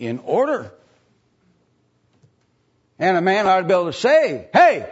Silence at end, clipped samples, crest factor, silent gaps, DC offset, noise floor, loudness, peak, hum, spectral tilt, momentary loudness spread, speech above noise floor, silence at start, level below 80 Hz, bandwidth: 0 s; under 0.1%; 18 dB; none; under 0.1%; -64 dBFS; -17 LUFS; -2 dBFS; none; -5.5 dB/octave; 8 LU; 47 dB; 0 s; -66 dBFS; 8 kHz